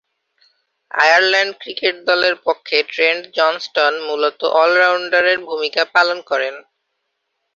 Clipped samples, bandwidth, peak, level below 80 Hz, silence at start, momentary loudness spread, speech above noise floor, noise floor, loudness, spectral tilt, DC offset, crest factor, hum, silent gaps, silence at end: under 0.1%; 7.6 kHz; 0 dBFS; -68 dBFS; 0.95 s; 8 LU; 57 dB; -73 dBFS; -16 LUFS; -1 dB/octave; under 0.1%; 18 dB; none; none; 0.95 s